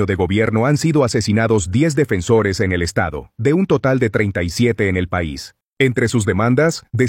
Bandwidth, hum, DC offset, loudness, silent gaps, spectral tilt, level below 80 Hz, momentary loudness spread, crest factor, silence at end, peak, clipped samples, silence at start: 16.5 kHz; none; under 0.1%; -17 LUFS; 5.63-5.73 s; -6 dB/octave; -40 dBFS; 6 LU; 14 dB; 0 s; -2 dBFS; under 0.1%; 0 s